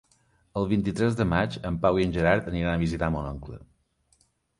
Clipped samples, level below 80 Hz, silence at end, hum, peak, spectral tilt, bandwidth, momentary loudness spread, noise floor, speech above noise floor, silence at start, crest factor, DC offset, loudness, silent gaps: under 0.1%; -42 dBFS; 0.95 s; none; -6 dBFS; -7.5 dB/octave; 11.5 kHz; 12 LU; -67 dBFS; 42 dB; 0.55 s; 20 dB; under 0.1%; -26 LUFS; none